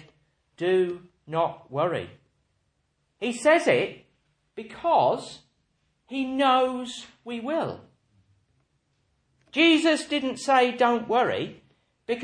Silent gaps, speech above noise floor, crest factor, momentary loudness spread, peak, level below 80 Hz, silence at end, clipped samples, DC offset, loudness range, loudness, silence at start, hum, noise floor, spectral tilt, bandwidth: none; 49 dB; 20 dB; 18 LU; -8 dBFS; -70 dBFS; 0 s; under 0.1%; under 0.1%; 5 LU; -24 LUFS; 0.6 s; none; -73 dBFS; -4.5 dB/octave; 10.5 kHz